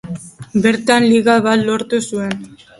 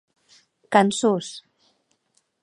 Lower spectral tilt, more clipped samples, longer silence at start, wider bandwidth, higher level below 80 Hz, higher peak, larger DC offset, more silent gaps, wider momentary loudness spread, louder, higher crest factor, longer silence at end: about the same, -5 dB/octave vs -4.5 dB/octave; neither; second, 0.05 s vs 0.7 s; about the same, 11.5 kHz vs 11 kHz; first, -54 dBFS vs -74 dBFS; about the same, 0 dBFS vs -2 dBFS; neither; neither; second, 15 LU vs 19 LU; first, -15 LUFS vs -21 LUFS; second, 16 dB vs 24 dB; second, 0.25 s vs 1.05 s